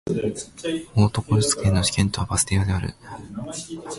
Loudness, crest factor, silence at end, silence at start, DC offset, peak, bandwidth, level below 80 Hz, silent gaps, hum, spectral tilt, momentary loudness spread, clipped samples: -23 LUFS; 16 dB; 0 s; 0.05 s; under 0.1%; -6 dBFS; 12 kHz; -38 dBFS; none; none; -4.5 dB/octave; 13 LU; under 0.1%